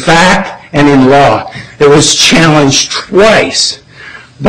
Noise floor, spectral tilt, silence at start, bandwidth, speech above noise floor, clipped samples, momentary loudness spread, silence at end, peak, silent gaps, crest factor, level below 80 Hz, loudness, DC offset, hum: -30 dBFS; -3.5 dB/octave; 0 s; 16.5 kHz; 24 dB; 0.4%; 9 LU; 0 s; 0 dBFS; none; 8 dB; -32 dBFS; -6 LUFS; 1%; none